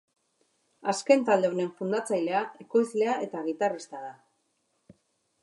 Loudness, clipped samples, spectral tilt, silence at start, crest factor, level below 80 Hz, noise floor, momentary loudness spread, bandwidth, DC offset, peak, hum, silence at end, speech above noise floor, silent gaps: -28 LUFS; under 0.1%; -5 dB/octave; 0.85 s; 22 dB; -84 dBFS; -75 dBFS; 13 LU; 11.5 kHz; under 0.1%; -8 dBFS; none; 1.3 s; 48 dB; none